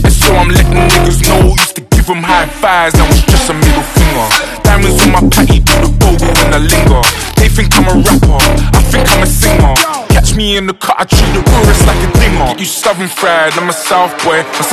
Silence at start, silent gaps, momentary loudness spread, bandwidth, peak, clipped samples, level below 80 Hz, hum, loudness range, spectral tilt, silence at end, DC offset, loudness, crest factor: 0 s; none; 4 LU; 14 kHz; 0 dBFS; 0.3%; -12 dBFS; none; 2 LU; -4.5 dB/octave; 0 s; under 0.1%; -8 LUFS; 8 dB